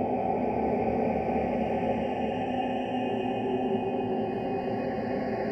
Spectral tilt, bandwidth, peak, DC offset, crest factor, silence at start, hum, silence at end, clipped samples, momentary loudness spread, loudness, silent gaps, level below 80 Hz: -8.5 dB/octave; 8 kHz; -16 dBFS; under 0.1%; 14 dB; 0 s; none; 0 s; under 0.1%; 3 LU; -29 LUFS; none; -52 dBFS